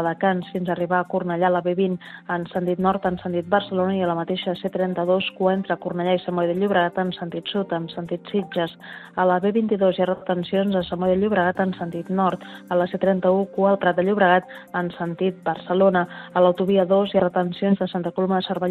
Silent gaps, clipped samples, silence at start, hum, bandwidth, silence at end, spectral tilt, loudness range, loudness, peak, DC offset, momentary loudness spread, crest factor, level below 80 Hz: none; under 0.1%; 0 s; none; 4.5 kHz; 0 s; -8.5 dB/octave; 3 LU; -22 LUFS; -4 dBFS; under 0.1%; 8 LU; 18 dB; -60 dBFS